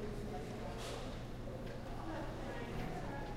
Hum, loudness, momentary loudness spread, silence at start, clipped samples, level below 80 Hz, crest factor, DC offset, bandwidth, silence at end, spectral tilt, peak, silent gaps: none; -45 LUFS; 3 LU; 0 s; under 0.1%; -50 dBFS; 12 dB; under 0.1%; 16 kHz; 0 s; -6 dB/octave; -30 dBFS; none